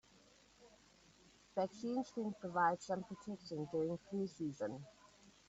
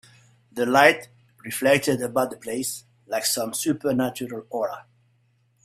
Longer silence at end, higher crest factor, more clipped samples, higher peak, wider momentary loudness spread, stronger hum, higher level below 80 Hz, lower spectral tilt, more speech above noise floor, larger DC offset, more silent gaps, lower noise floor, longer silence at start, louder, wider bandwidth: second, 0.2 s vs 0.85 s; about the same, 20 dB vs 24 dB; neither; second, -22 dBFS vs 0 dBFS; second, 12 LU vs 16 LU; neither; second, -78 dBFS vs -66 dBFS; first, -5.5 dB/octave vs -3.5 dB/octave; second, 27 dB vs 42 dB; neither; neither; about the same, -68 dBFS vs -65 dBFS; about the same, 0.6 s vs 0.55 s; second, -42 LUFS vs -23 LUFS; second, 8 kHz vs 16 kHz